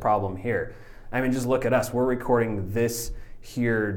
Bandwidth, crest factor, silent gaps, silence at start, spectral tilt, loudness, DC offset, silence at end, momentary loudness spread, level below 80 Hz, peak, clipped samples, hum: 19 kHz; 16 dB; none; 0 s; -6 dB/octave; -26 LUFS; under 0.1%; 0 s; 12 LU; -42 dBFS; -10 dBFS; under 0.1%; none